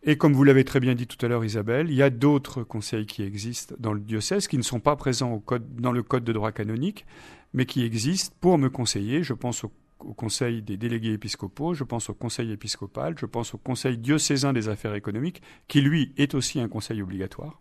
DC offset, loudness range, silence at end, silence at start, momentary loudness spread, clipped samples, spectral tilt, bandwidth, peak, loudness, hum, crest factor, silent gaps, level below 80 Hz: under 0.1%; 5 LU; 0.1 s; 0.05 s; 11 LU; under 0.1%; -5.5 dB/octave; 13.5 kHz; -6 dBFS; -26 LUFS; none; 20 dB; none; -54 dBFS